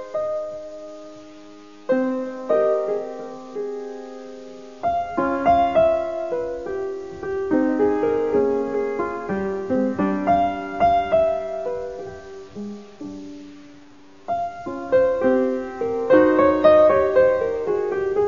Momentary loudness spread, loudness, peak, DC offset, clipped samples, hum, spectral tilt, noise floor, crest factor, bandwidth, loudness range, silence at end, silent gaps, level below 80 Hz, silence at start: 20 LU; -21 LUFS; -4 dBFS; 0.4%; under 0.1%; none; -7 dB/octave; -48 dBFS; 18 dB; 7.4 kHz; 8 LU; 0 s; none; -50 dBFS; 0 s